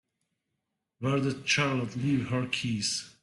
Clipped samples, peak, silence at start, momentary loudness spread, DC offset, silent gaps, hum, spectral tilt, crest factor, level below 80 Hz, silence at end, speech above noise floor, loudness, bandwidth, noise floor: under 0.1%; -12 dBFS; 1 s; 5 LU; under 0.1%; none; none; -4.5 dB/octave; 18 dB; -64 dBFS; 0.15 s; 54 dB; -29 LUFS; 12 kHz; -83 dBFS